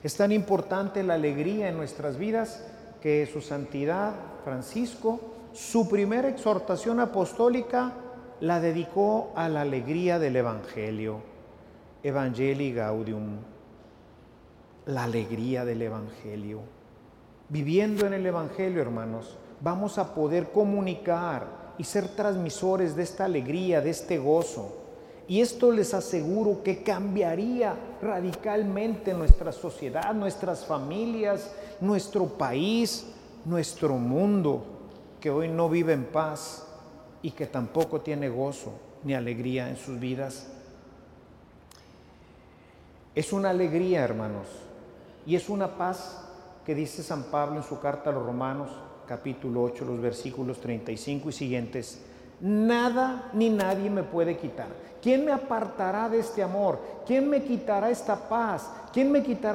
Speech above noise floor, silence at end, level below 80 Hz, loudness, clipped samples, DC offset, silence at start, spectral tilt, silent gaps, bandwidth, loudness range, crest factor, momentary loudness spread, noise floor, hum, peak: 26 dB; 0 s; -40 dBFS; -28 LUFS; under 0.1%; under 0.1%; 0 s; -6.5 dB/octave; none; 16.5 kHz; 6 LU; 28 dB; 14 LU; -53 dBFS; none; 0 dBFS